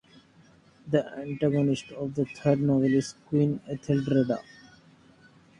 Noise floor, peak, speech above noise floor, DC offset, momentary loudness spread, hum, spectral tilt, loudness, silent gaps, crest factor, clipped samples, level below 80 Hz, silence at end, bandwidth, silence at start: -58 dBFS; -10 dBFS; 31 dB; under 0.1%; 8 LU; none; -7.5 dB/octave; -27 LUFS; none; 18 dB; under 0.1%; -62 dBFS; 1.2 s; 10.5 kHz; 0.85 s